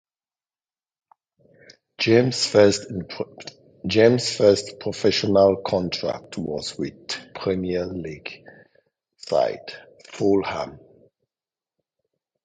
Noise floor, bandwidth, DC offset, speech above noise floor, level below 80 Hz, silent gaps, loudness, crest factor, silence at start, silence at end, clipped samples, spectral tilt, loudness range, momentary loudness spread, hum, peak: under -90 dBFS; 9.4 kHz; under 0.1%; over 69 dB; -54 dBFS; none; -22 LUFS; 22 dB; 2 s; 1.7 s; under 0.1%; -5 dB/octave; 8 LU; 19 LU; none; -2 dBFS